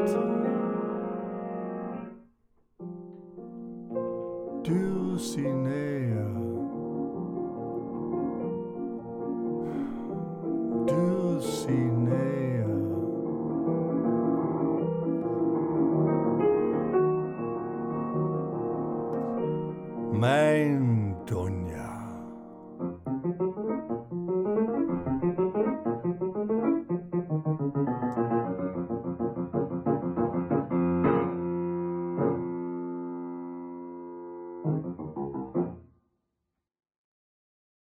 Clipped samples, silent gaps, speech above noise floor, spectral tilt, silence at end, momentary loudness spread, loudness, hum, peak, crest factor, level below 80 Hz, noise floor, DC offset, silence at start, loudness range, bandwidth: under 0.1%; none; 56 dB; -8 dB/octave; 2 s; 12 LU; -30 LUFS; none; -12 dBFS; 18 dB; -60 dBFS; -84 dBFS; under 0.1%; 0 s; 8 LU; 14.5 kHz